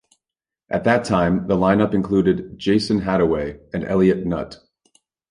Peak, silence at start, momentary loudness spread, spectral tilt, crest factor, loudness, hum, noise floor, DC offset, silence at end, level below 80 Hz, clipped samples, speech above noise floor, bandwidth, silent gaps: -4 dBFS; 0.7 s; 9 LU; -7 dB/octave; 16 dB; -20 LUFS; none; -88 dBFS; under 0.1%; 0.75 s; -44 dBFS; under 0.1%; 69 dB; 11 kHz; none